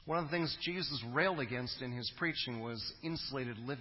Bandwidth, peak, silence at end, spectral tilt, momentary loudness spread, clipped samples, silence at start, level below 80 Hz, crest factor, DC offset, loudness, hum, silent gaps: 5.8 kHz; -18 dBFS; 0 s; -8 dB/octave; 7 LU; under 0.1%; 0 s; -64 dBFS; 20 dB; under 0.1%; -37 LUFS; none; none